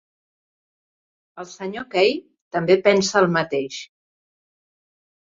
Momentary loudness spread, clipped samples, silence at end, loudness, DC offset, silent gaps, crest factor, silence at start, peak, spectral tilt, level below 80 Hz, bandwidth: 17 LU; under 0.1%; 1.4 s; -20 LUFS; under 0.1%; 2.41-2.51 s; 20 dB; 1.35 s; -2 dBFS; -4.5 dB/octave; -64 dBFS; 7.6 kHz